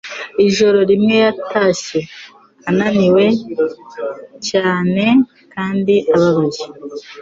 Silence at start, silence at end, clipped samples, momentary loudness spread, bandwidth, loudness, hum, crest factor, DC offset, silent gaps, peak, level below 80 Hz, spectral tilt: 0.05 s; 0 s; under 0.1%; 15 LU; 7.8 kHz; -15 LUFS; none; 12 dB; under 0.1%; none; -2 dBFS; -54 dBFS; -5.5 dB/octave